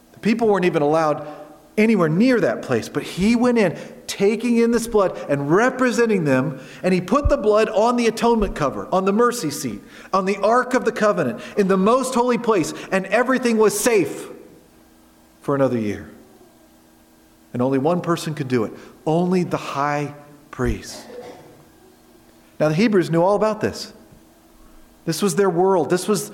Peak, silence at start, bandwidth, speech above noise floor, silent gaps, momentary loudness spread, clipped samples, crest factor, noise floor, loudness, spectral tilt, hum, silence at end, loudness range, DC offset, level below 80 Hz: -4 dBFS; 0.25 s; 16.5 kHz; 33 dB; none; 13 LU; under 0.1%; 16 dB; -52 dBFS; -19 LUFS; -5.5 dB/octave; none; 0 s; 6 LU; under 0.1%; -42 dBFS